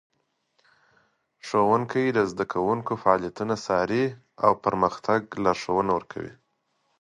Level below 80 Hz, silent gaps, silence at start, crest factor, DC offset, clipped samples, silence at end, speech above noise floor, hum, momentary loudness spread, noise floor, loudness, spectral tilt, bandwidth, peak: -58 dBFS; none; 1.45 s; 22 dB; under 0.1%; under 0.1%; 0.7 s; 49 dB; none; 7 LU; -73 dBFS; -25 LUFS; -6 dB/octave; 11 kHz; -4 dBFS